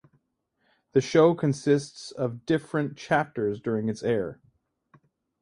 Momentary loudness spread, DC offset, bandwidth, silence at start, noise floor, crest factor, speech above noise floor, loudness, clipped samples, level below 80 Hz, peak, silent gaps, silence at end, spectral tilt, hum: 11 LU; under 0.1%; 11 kHz; 0.95 s; -74 dBFS; 20 dB; 49 dB; -26 LUFS; under 0.1%; -64 dBFS; -6 dBFS; none; 1.1 s; -6.5 dB/octave; none